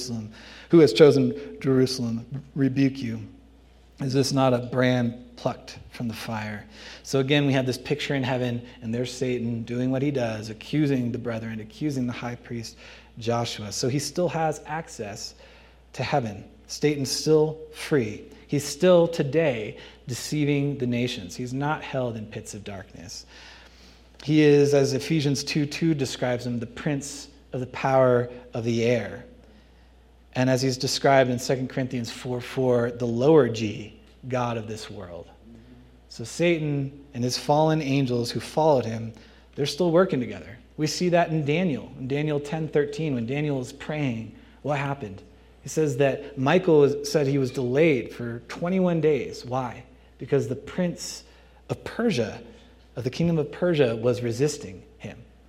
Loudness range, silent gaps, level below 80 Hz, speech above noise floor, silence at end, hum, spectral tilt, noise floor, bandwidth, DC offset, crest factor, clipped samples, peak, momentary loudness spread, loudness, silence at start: 6 LU; none; -54 dBFS; 29 dB; 0.25 s; none; -6 dB/octave; -53 dBFS; 15.5 kHz; under 0.1%; 22 dB; under 0.1%; -2 dBFS; 18 LU; -25 LUFS; 0 s